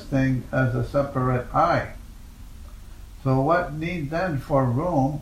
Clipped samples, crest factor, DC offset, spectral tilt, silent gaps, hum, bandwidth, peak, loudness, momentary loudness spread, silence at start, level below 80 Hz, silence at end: under 0.1%; 16 dB; under 0.1%; -8 dB/octave; none; none; 14 kHz; -8 dBFS; -24 LUFS; 21 LU; 0 s; -40 dBFS; 0 s